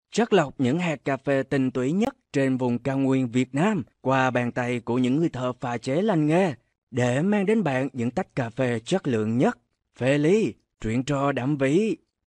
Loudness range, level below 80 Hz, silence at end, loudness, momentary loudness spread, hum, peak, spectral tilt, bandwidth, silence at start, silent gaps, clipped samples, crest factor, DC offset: 1 LU; -56 dBFS; 0.3 s; -24 LUFS; 6 LU; none; -8 dBFS; -6.5 dB/octave; 10.5 kHz; 0.15 s; 6.78-6.87 s; under 0.1%; 16 dB; under 0.1%